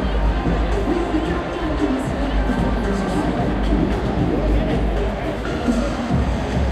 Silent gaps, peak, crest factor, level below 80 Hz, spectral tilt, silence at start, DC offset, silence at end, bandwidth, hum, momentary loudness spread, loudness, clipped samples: none; -6 dBFS; 14 dB; -24 dBFS; -7 dB/octave; 0 s; under 0.1%; 0 s; 10 kHz; none; 3 LU; -21 LUFS; under 0.1%